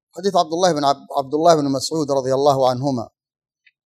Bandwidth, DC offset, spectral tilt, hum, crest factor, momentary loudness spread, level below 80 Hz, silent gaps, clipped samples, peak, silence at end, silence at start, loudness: 13.5 kHz; under 0.1%; -5 dB/octave; none; 18 dB; 8 LU; -68 dBFS; none; under 0.1%; -2 dBFS; 0.8 s; 0.15 s; -18 LUFS